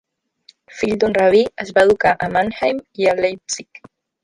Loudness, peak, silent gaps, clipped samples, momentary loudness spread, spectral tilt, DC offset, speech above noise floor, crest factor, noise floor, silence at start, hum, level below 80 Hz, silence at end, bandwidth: -17 LUFS; -2 dBFS; none; under 0.1%; 11 LU; -4 dB/octave; under 0.1%; 36 dB; 16 dB; -53 dBFS; 0.75 s; none; -50 dBFS; 0.6 s; 11.5 kHz